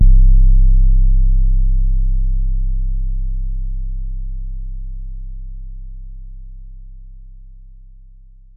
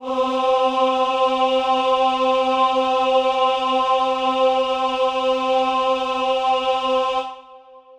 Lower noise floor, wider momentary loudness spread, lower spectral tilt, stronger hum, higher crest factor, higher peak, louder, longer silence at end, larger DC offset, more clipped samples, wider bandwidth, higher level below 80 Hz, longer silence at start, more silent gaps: about the same, -41 dBFS vs -44 dBFS; first, 24 LU vs 3 LU; first, -15 dB/octave vs -2.5 dB/octave; neither; about the same, 12 dB vs 12 dB; first, -2 dBFS vs -6 dBFS; about the same, -20 LUFS vs -19 LUFS; first, 1.05 s vs 0.2 s; neither; neither; second, 0.3 kHz vs 9.8 kHz; first, -14 dBFS vs -56 dBFS; about the same, 0 s vs 0 s; neither